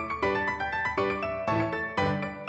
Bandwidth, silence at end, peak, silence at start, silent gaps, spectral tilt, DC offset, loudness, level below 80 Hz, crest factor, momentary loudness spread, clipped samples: 8.4 kHz; 0 s; -14 dBFS; 0 s; none; -6.5 dB/octave; under 0.1%; -28 LUFS; -52 dBFS; 14 dB; 2 LU; under 0.1%